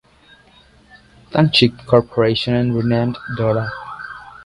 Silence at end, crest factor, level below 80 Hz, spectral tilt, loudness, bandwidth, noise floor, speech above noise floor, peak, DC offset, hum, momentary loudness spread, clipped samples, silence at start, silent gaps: 0.05 s; 18 dB; -46 dBFS; -7 dB/octave; -17 LUFS; 11.5 kHz; -50 dBFS; 34 dB; 0 dBFS; under 0.1%; none; 16 LU; under 0.1%; 1.3 s; none